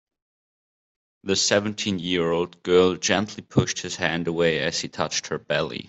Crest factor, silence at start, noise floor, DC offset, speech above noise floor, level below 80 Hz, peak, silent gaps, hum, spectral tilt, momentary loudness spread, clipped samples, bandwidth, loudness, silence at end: 20 dB; 1.25 s; under -90 dBFS; under 0.1%; over 66 dB; -58 dBFS; -4 dBFS; none; none; -3.5 dB/octave; 7 LU; under 0.1%; 8.4 kHz; -23 LUFS; 0 s